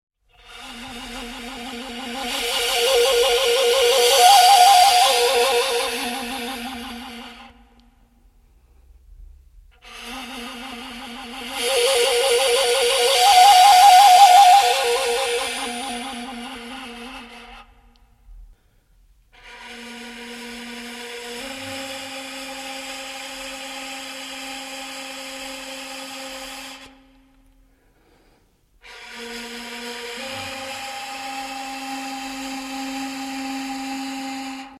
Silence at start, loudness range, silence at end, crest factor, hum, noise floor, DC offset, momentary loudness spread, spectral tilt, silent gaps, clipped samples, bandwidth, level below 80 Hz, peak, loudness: 0.5 s; 24 LU; 0.05 s; 20 dB; none; -59 dBFS; under 0.1%; 23 LU; 0 dB/octave; none; under 0.1%; 16.5 kHz; -52 dBFS; 0 dBFS; -17 LUFS